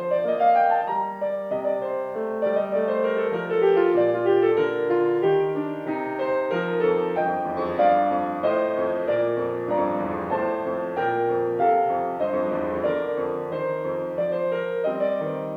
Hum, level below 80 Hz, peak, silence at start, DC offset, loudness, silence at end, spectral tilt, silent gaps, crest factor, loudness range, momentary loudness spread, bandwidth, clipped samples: none; -62 dBFS; -8 dBFS; 0 s; under 0.1%; -24 LUFS; 0 s; -8 dB/octave; none; 14 dB; 3 LU; 7 LU; 6.4 kHz; under 0.1%